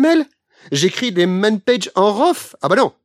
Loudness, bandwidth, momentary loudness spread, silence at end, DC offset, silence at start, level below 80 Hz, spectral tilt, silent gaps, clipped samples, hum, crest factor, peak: -16 LUFS; 15.5 kHz; 5 LU; 0.15 s; under 0.1%; 0 s; -70 dBFS; -4.5 dB/octave; none; under 0.1%; none; 16 dB; 0 dBFS